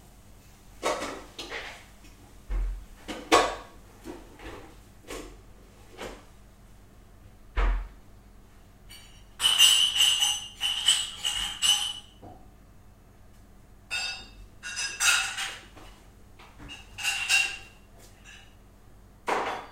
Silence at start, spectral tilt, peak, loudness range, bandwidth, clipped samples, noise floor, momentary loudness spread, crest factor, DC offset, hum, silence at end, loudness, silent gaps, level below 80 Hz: 0.65 s; -0.5 dB/octave; -4 dBFS; 17 LU; 16 kHz; under 0.1%; -53 dBFS; 24 LU; 26 dB; under 0.1%; 50 Hz at -60 dBFS; 0 s; -25 LUFS; none; -42 dBFS